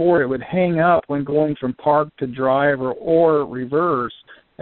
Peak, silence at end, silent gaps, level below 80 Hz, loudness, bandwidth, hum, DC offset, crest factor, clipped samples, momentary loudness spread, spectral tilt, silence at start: -4 dBFS; 0.3 s; none; -54 dBFS; -19 LUFS; 4.3 kHz; none; under 0.1%; 16 dB; under 0.1%; 7 LU; -6 dB/octave; 0 s